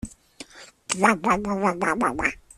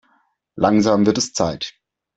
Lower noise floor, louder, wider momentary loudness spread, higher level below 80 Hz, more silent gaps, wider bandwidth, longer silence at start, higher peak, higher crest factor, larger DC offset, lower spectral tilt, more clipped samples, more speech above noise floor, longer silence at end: second, -46 dBFS vs -63 dBFS; second, -23 LUFS vs -18 LUFS; first, 22 LU vs 12 LU; about the same, -50 dBFS vs -52 dBFS; neither; first, 13.5 kHz vs 8.2 kHz; second, 0.05 s vs 0.55 s; about the same, -4 dBFS vs -4 dBFS; first, 22 dB vs 16 dB; neither; about the same, -4 dB/octave vs -5 dB/octave; neither; second, 24 dB vs 46 dB; second, 0.2 s vs 0.45 s